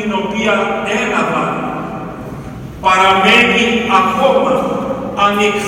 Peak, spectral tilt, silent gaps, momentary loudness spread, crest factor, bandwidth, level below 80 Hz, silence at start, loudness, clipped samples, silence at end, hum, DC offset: 0 dBFS; -4 dB/octave; none; 17 LU; 14 dB; 17 kHz; -42 dBFS; 0 s; -13 LUFS; under 0.1%; 0 s; none; under 0.1%